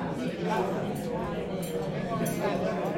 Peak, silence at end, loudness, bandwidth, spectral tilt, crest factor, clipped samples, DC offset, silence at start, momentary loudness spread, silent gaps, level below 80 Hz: -16 dBFS; 0 s; -31 LUFS; 16.5 kHz; -6 dB/octave; 14 dB; under 0.1%; under 0.1%; 0 s; 4 LU; none; -54 dBFS